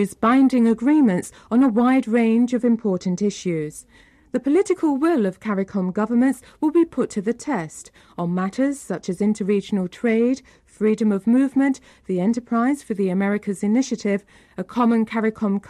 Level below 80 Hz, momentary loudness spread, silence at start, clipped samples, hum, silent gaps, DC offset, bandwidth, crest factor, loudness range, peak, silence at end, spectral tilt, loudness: -60 dBFS; 10 LU; 0 s; under 0.1%; none; none; under 0.1%; 13 kHz; 12 dB; 4 LU; -8 dBFS; 0.1 s; -7 dB/octave; -21 LUFS